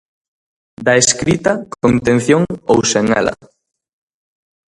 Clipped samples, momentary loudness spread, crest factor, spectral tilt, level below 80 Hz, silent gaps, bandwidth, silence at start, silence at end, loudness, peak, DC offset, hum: under 0.1%; 6 LU; 16 dB; -4 dB/octave; -44 dBFS; none; 11.5 kHz; 0.8 s; 1.35 s; -14 LUFS; 0 dBFS; under 0.1%; none